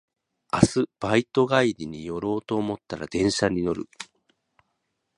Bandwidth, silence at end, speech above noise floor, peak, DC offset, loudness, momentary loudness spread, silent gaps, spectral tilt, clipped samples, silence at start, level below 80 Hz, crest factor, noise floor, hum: 11 kHz; 1.15 s; 53 dB; 0 dBFS; under 0.1%; -25 LUFS; 12 LU; none; -5.5 dB/octave; under 0.1%; 0.55 s; -50 dBFS; 26 dB; -77 dBFS; none